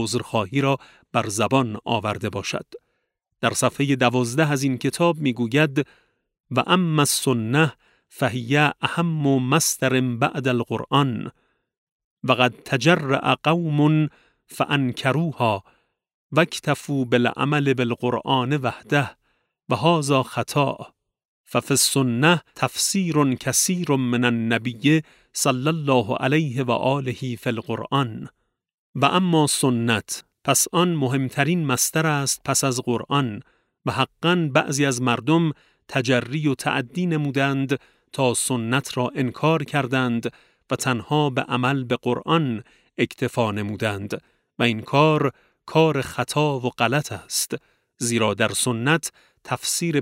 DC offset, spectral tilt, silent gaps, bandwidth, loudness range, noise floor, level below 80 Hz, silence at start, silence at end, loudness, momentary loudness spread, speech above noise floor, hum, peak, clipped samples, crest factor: under 0.1%; -4.5 dB/octave; 6.40-6.44 s, 11.78-12.17 s, 16.14-16.30 s, 21.25-21.44 s, 28.74-28.94 s; 16 kHz; 3 LU; -75 dBFS; -62 dBFS; 0 s; 0 s; -22 LUFS; 9 LU; 54 dB; none; -2 dBFS; under 0.1%; 20 dB